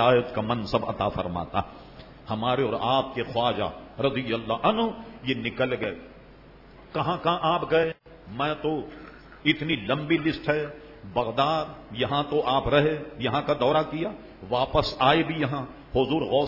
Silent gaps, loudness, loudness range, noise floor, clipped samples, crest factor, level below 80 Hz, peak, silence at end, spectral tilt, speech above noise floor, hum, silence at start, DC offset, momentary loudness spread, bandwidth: none; -26 LUFS; 3 LU; -49 dBFS; under 0.1%; 20 dB; -50 dBFS; -6 dBFS; 0 s; -7.5 dB/octave; 24 dB; none; 0 s; under 0.1%; 12 LU; 5.8 kHz